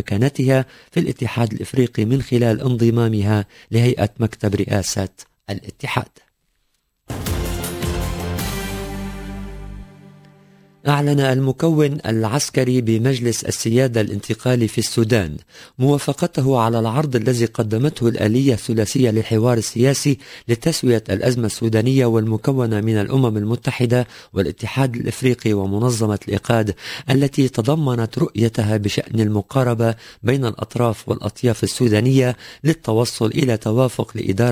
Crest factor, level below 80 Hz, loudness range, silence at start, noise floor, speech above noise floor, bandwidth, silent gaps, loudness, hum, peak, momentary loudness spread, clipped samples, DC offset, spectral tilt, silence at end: 16 dB; -40 dBFS; 8 LU; 0 s; -68 dBFS; 50 dB; 16 kHz; none; -19 LUFS; none; -2 dBFS; 8 LU; under 0.1%; under 0.1%; -6 dB/octave; 0 s